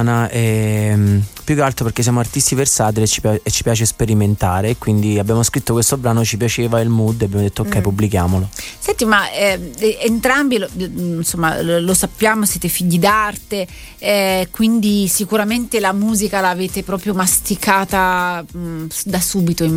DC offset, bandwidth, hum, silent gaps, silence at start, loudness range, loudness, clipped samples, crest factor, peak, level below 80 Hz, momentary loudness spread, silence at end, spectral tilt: under 0.1%; 16.5 kHz; none; none; 0 s; 1 LU; -16 LUFS; under 0.1%; 16 dB; 0 dBFS; -38 dBFS; 7 LU; 0 s; -4.5 dB/octave